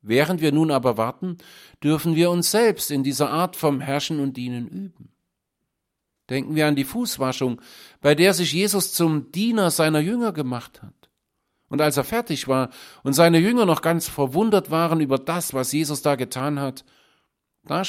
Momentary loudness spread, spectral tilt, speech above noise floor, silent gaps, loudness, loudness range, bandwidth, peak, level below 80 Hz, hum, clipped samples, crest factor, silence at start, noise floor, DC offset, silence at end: 12 LU; -5 dB/octave; 58 dB; none; -21 LUFS; 6 LU; 16.5 kHz; -2 dBFS; -60 dBFS; none; under 0.1%; 20 dB; 0.05 s; -79 dBFS; under 0.1%; 0 s